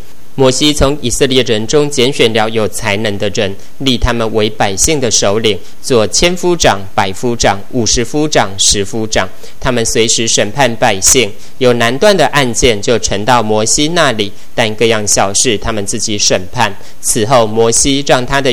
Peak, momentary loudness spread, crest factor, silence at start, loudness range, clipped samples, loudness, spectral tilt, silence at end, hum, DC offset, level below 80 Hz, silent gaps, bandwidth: 0 dBFS; 6 LU; 12 dB; 0.35 s; 3 LU; 0.8%; -11 LUFS; -3 dB/octave; 0 s; none; 10%; -28 dBFS; none; over 20 kHz